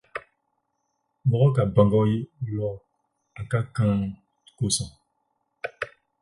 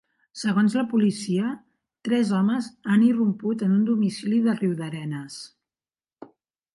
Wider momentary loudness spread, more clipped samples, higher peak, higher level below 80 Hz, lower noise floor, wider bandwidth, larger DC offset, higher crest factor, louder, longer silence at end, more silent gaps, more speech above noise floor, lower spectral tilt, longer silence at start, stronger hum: first, 18 LU vs 15 LU; neither; first, -6 dBFS vs -10 dBFS; first, -50 dBFS vs -70 dBFS; second, -76 dBFS vs under -90 dBFS; about the same, 11.5 kHz vs 11.5 kHz; neither; first, 20 dB vs 14 dB; about the same, -24 LUFS vs -24 LUFS; second, 0.35 s vs 0.5 s; neither; second, 53 dB vs over 67 dB; about the same, -6 dB/octave vs -6.5 dB/octave; second, 0.15 s vs 0.35 s; neither